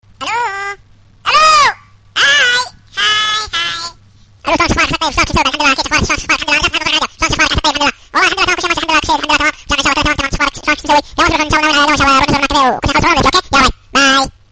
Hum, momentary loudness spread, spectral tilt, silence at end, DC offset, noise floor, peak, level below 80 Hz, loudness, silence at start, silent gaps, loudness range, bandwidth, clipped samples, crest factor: none; 8 LU; -2.5 dB/octave; 0.2 s; under 0.1%; -44 dBFS; 0 dBFS; -30 dBFS; -11 LUFS; 0.2 s; none; 3 LU; 10 kHz; under 0.1%; 12 dB